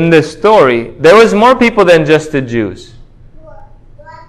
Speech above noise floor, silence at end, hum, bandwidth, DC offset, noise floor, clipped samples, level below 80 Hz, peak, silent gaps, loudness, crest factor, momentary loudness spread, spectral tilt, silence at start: 27 dB; 0.2 s; none; 12.5 kHz; under 0.1%; -35 dBFS; 2%; -38 dBFS; 0 dBFS; none; -8 LUFS; 10 dB; 11 LU; -6 dB/octave; 0 s